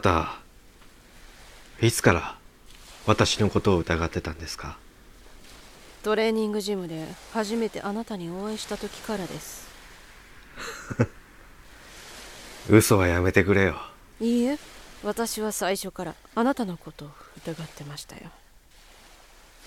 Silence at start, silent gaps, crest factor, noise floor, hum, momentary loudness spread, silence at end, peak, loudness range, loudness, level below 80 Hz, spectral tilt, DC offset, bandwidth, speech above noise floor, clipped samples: 0 s; none; 24 dB; -53 dBFS; none; 23 LU; 1.35 s; -2 dBFS; 11 LU; -26 LUFS; -48 dBFS; -5 dB/octave; under 0.1%; 17 kHz; 28 dB; under 0.1%